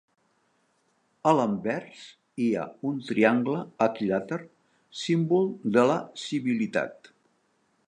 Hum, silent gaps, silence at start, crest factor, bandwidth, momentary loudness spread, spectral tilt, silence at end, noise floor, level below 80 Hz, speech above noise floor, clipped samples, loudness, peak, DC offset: none; none; 1.25 s; 22 dB; 10.5 kHz; 13 LU; -6.5 dB/octave; 0.95 s; -70 dBFS; -72 dBFS; 44 dB; under 0.1%; -27 LUFS; -6 dBFS; under 0.1%